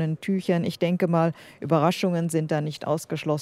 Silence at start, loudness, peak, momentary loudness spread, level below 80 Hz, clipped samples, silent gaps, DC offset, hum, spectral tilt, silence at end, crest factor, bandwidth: 0 s; -25 LUFS; -8 dBFS; 6 LU; -68 dBFS; under 0.1%; none; under 0.1%; none; -6.5 dB/octave; 0 s; 18 dB; 15 kHz